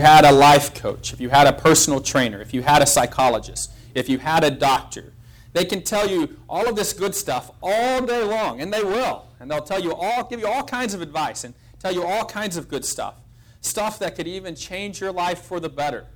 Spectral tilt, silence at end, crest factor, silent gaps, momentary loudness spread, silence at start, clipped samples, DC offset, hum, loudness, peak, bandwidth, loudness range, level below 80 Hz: -3.5 dB/octave; 0.05 s; 16 dB; none; 15 LU; 0 s; under 0.1%; under 0.1%; none; -20 LUFS; -4 dBFS; over 20 kHz; 9 LU; -46 dBFS